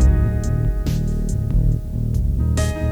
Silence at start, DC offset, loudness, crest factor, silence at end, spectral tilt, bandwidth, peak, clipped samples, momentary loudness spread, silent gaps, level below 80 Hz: 0 s; under 0.1%; -21 LUFS; 14 dB; 0 s; -7 dB/octave; 15.5 kHz; -4 dBFS; under 0.1%; 4 LU; none; -20 dBFS